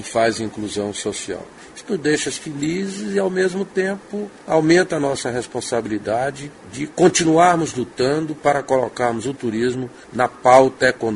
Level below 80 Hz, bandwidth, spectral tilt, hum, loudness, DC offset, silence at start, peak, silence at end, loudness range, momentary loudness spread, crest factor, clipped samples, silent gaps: -54 dBFS; 11.5 kHz; -4.5 dB/octave; none; -19 LUFS; under 0.1%; 0 s; 0 dBFS; 0 s; 5 LU; 14 LU; 20 dB; under 0.1%; none